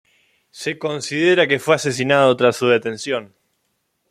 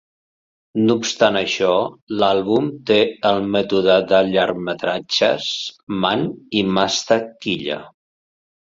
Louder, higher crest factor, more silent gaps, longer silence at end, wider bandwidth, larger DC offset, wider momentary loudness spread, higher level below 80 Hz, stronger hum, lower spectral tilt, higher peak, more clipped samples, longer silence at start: about the same, -18 LUFS vs -18 LUFS; about the same, 18 dB vs 18 dB; second, none vs 2.02-2.07 s, 5.83-5.87 s; about the same, 0.85 s vs 0.75 s; first, 15 kHz vs 7.8 kHz; neither; about the same, 10 LU vs 8 LU; second, -64 dBFS vs -56 dBFS; neither; about the same, -4.5 dB/octave vs -4.5 dB/octave; about the same, -2 dBFS vs -2 dBFS; neither; second, 0.55 s vs 0.75 s